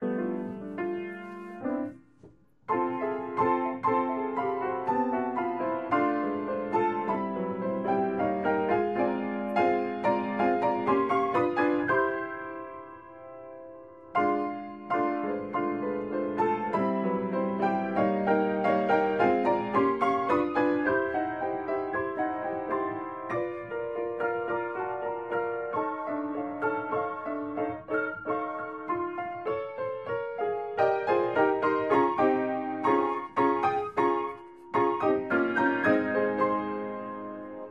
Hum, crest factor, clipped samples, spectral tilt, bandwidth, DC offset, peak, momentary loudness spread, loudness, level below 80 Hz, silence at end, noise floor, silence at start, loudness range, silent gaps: none; 18 dB; under 0.1%; -8 dB/octave; 7.4 kHz; under 0.1%; -10 dBFS; 10 LU; -29 LUFS; -66 dBFS; 0 s; -57 dBFS; 0 s; 6 LU; none